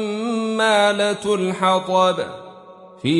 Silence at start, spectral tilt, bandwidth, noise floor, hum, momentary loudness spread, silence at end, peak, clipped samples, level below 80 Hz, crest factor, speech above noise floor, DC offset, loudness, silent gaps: 0 s; -4.5 dB/octave; 11.5 kHz; -43 dBFS; none; 11 LU; 0 s; -4 dBFS; under 0.1%; -64 dBFS; 14 dB; 24 dB; under 0.1%; -19 LUFS; none